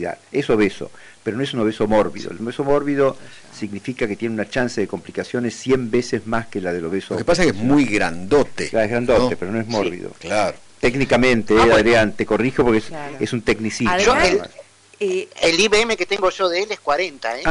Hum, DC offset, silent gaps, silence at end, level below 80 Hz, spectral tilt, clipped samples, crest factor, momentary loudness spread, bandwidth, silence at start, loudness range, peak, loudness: none; under 0.1%; none; 0 s; -40 dBFS; -4.5 dB/octave; under 0.1%; 12 dB; 11 LU; 11 kHz; 0 s; 6 LU; -6 dBFS; -19 LUFS